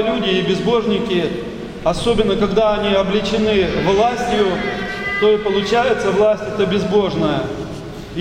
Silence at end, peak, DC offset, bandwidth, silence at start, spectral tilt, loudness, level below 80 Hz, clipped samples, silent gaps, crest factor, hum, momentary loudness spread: 0 s; -2 dBFS; under 0.1%; 11.5 kHz; 0 s; -5.5 dB/octave; -17 LUFS; -36 dBFS; under 0.1%; none; 14 dB; none; 7 LU